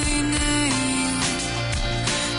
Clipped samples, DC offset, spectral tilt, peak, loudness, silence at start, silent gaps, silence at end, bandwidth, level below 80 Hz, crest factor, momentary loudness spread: under 0.1%; under 0.1%; -3 dB/octave; -12 dBFS; -22 LUFS; 0 s; none; 0 s; 11 kHz; -32 dBFS; 12 dB; 4 LU